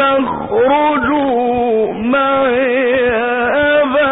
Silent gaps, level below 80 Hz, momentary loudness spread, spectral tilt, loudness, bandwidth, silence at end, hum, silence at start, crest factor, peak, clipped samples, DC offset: none; -44 dBFS; 3 LU; -10.5 dB/octave; -13 LUFS; 4 kHz; 0 s; none; 0 s; 8 dB; -4 dBFS; under 0.1%; under 0.1%